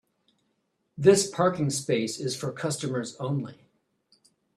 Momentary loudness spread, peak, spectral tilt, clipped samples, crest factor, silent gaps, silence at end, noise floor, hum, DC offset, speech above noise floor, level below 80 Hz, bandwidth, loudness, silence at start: 11 LU; -6 dBFS; -5 dB/octave; under 0.1%; 22 dB; none; 1.05 s; -75 dBFS; none; under 0.1%; 49 dB; -68 dBFS; 13.5 kHz; -26 LUFS; 0.95 s